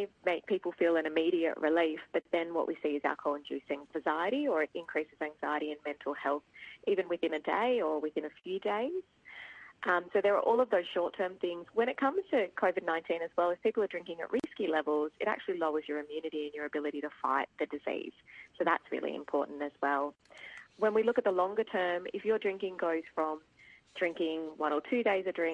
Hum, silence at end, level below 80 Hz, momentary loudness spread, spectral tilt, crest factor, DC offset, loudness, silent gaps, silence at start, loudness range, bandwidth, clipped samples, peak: none; 0 s; -76 dBFS; 9 LU; -6 dB/octave; 20 dB; under 0.1%; -33 LUFS; none; 0 s; 3 LU; 8.6 kHz; under 0.1%; -14 dBFS